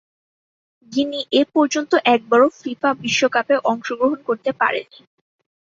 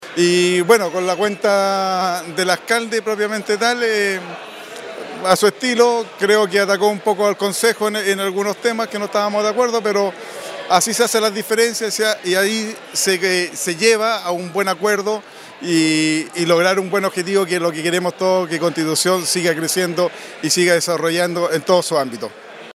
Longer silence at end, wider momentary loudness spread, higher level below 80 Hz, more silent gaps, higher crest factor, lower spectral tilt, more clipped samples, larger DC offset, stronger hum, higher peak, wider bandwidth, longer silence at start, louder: first, 0.8 s vs 0 s; about the same, 7 LU vs 8 LU; about the same, -66 dBFS vs -70 dBFS; neither; about the same, 18 dB vs 18 dB; about the same, -3.5 dB/octave vs -3 dB/octave; neither; neither; neither; about the same, -2 dBFS vs 0 dBFS; second, 7.8 kHz vs 16 kHz; first, 0.9 s vs 0 s; about the same, -19 LUFS vs -17 LUFS